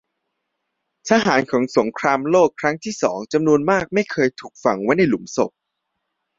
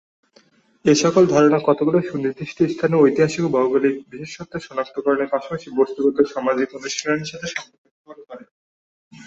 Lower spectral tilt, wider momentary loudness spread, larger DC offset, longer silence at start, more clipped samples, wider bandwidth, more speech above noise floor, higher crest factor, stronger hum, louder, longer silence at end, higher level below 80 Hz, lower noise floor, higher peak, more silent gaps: about the same, -5 dB/octave vs -5.5 dB/octave; second, 7 LU vs 15 LU; neither; first, 1.05 s vs 0.85 s; neither; about the same, 7.8 kHz vs 8 kHz; first, 58 dB vs 37 dB; about the same, 18 dB vs 18 dB; neither; about the same, -19 LUFS vs -19 LUFS; first, 0.9 s vs 0 s; about the same, -58 dBFS vs -60 dBFS; first, -77 dBFS vs -56 dBFS; about the same, -2 dBFS vs -2 dBFS; second, none vs 7.78-7.85 s, 7.91-8.05 s, 8.51-9.11 s